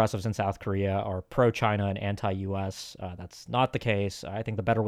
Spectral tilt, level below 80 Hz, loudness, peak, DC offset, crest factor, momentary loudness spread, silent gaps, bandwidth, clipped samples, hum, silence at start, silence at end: -6.5 dB/octave; -56 dBFS; -29 LUFS; -12 dBFS; under 0.1%; 18 dB; 12 LU; none; 14 kHz; under 0.1%; none; 0 s; 0 s